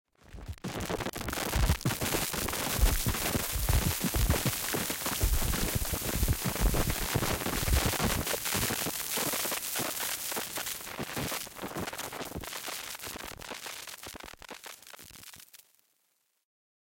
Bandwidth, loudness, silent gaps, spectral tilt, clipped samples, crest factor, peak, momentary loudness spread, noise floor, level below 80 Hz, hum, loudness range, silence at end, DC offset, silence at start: 17 kHz; -31 LUFS; none; -3.5 dB/octave; under 0.1%; 20 dB; -14 dBFS; 15 LU; -75 dBFS; -38 dBFS; none; 11 LU; 1.3 s; under 0.1%; 0.3 s